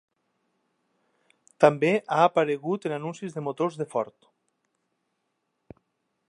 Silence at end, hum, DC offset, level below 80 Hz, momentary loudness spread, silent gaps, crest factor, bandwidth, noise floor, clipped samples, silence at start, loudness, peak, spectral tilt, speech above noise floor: 2.25 s; none; under 0.1%; -76 dBFS; 12 LU; none; 24 dB; 11 kHz; -78 dBFS; under 0.1%; 1.6 s; -25 LUFS; -4 dBFS; -6.5 dB/octave; 53 dB